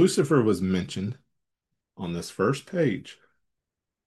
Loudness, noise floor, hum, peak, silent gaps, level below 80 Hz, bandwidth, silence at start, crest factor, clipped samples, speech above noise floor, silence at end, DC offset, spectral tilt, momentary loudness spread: -26 LUFS; -86 dBFS; none; -10 dBFS; none; -66 dBFS; 12.5 kHz; 0 s; 18 dB; under 0.1%; 61 dB; 0.95 s; under 0.1%; -6 dB/octave; 15 LU